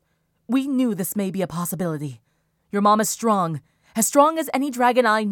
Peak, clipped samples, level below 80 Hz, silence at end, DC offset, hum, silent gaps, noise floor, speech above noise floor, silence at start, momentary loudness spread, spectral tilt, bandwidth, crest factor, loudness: -2 dBFS; under 0.1%; -66 dBFS; 0 s; under 0.1%; none; none; -48 dBFS; 27 dB; 0.5 s; 11 LU; -4.5 dB/octave; 19 kHz; 20 dB; -21 LUFS